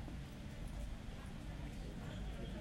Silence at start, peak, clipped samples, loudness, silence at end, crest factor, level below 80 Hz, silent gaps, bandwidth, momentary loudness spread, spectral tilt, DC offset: 0 s; -34 dBFS; under 0.1%; -49 LUFS; 0 s; 12 dB; -50 dBFS; none; 16 kHz; 3 LU; -6 dB/octave; under 0.1%